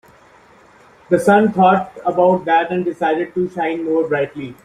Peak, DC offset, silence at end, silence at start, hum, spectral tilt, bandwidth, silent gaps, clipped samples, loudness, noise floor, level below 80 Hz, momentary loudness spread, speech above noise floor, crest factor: -2 dBFS; under 0.1%; 0.1 s; 1.1 s; none; -7 dB/octave; 14 kHz; none; under 0.1%; -16 LUFS; -48 dBFS; -58 dBFS; 8 LU; 32 dB; 16 dB